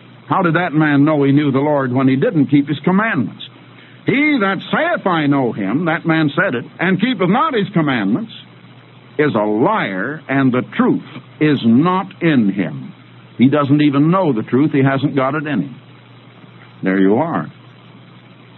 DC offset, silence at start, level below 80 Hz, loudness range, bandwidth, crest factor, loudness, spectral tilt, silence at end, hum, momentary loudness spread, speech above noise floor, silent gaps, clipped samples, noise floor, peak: under 0.1%; 0.25 s; -64 dBFS; 3 LU; 4.2 kHz; 16 dB; -16 LUFS; -11.5 dB/octave; 1.05 s; none; 10 LU; 27 dB; none; under 0.1%; -41 dBFS; 0 dBFS